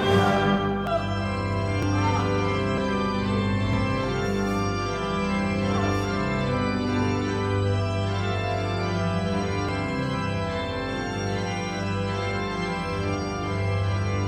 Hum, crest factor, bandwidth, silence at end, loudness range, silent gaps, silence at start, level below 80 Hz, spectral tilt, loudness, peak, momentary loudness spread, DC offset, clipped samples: 50 Hz at -40 dBFS; 16 dB; 9.4 kHz; 0 s; 3 LU; none; 0 s; -42 dBFS; -6.5 dB/octave; -26 LUFS; -8 dBFS; 4 LU; under 0.1%; under 0.1%